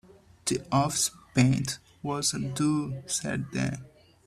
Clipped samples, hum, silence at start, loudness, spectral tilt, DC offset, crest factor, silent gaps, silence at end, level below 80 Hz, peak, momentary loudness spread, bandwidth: under 0.1%; none; 0.45 s; -28 LUFS; -4.5 dB/octave; under 0.1%; 20 dB; none; 0.4 s; -58 dBFS; -10 dBFS; 10 LU; 14 kHz